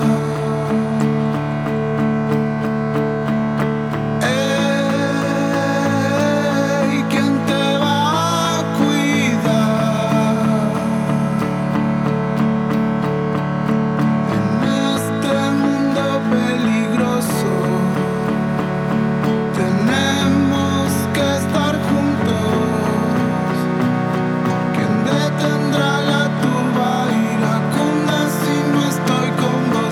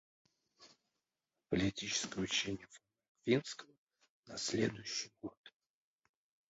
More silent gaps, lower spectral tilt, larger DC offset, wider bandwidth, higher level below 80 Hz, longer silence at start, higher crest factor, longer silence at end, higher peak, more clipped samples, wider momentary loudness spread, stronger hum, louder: second, none vs 3.09-3.15 s, 3.78-3.87 s, 4.10-4.23 s, 5.37-5.44 s; first, -6 dB/octave vs -3.5 dB/octave; neither; first, 16 kHz vs 7.6 kHz; first, -48 dBFS vs -66 dBFS; second, 0 s vs 0.6 s; second, 14 dB vs 24 dB; second, 0 s vs 1 s; first, -2 dBFS vs -18 dBFS; neither; second, 3 LU vs 15 LU; neither; first, -17 LUFS vs -38 LUFS